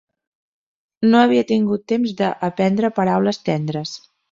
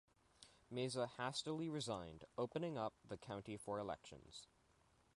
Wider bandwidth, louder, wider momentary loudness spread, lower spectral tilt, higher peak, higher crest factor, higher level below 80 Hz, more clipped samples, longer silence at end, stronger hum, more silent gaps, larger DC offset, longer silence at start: second, 7.6 kHz vs 11.5 kHz; first, -18 LUFS vs -47 LUFS; second, 11 LU vs 15 LU; first, -7 dB/octave vs -5 dB/octave; first, -4 dBFS vs -30 dBFS; about the same, 16 dB vs 18 dB; first, -62 dBFS vs -74 dBFS; neither; second, 0.35 s vs 0.7 s; neither; neither; neither; first, 1 s vs 0.4 s